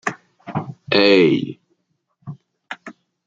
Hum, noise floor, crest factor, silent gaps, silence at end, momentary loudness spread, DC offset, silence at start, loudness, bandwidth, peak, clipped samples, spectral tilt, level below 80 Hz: none; -69 dBFS; 20 dB; none; 0.35 s; 25 LU; under 0.1%; 0.05 s; -17 LUFS; 7.8 kHz; -2 dBFS; under 0.1%; -6 dB/octave; -64 dBFS